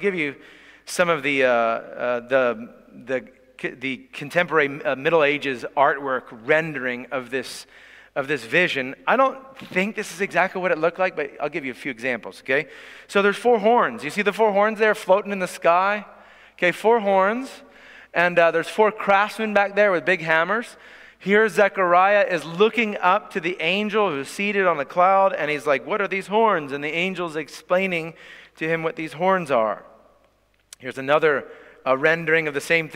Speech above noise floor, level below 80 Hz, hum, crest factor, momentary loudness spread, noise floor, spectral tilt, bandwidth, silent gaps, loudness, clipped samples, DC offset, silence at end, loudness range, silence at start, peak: 41 dB; -66 dBFS; none; 18 dB; 11 LU; -62 dBFS; -4.5 dB/octave; 16 kHz; none; -21 LUFS; under 0.1%; under 0.1%; 0 s; 5 LU; 0 s; -4 dBFS